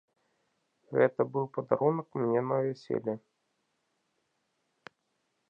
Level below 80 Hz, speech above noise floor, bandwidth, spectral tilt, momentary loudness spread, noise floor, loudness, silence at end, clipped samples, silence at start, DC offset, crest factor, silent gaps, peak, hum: -80 dBFS; 49 dB; 7 kHz; -9.5 dB/octave; 7 LU; -79 dBFS; -30 LUFS; 2.3 s; under 0.1%; 0.9 s; under 0.1%; 24 dB; none; -10 dBFS; none